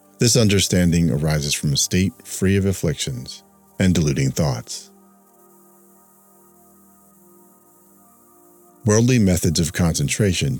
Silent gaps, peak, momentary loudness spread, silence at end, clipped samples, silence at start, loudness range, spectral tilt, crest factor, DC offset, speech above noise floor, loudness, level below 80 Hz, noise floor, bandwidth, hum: none; -4 dBFS; 11 LU; 0 s; under 0.1%; 0.2 s; 10 LU; -4.5 dB/octave; 18 dB; under 0.1%; 34 dB; -19 LUFS; -40 dBFS; -52 dBFS; 19 kHz; none